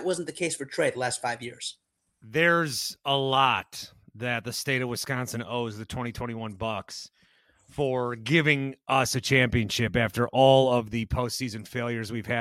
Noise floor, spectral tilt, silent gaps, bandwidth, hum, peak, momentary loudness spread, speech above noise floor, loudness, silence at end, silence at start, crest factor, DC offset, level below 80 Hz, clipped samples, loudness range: -63 dBFS; -4.5 dB/octave; none; 16.5 kHz; none; -6 dBFS; 13 LU; 37 dB; -26 LUFS; 0 s; 0 s; 22 dB; under 0.1%; -52 dBFS; under 0.1%; 8 LU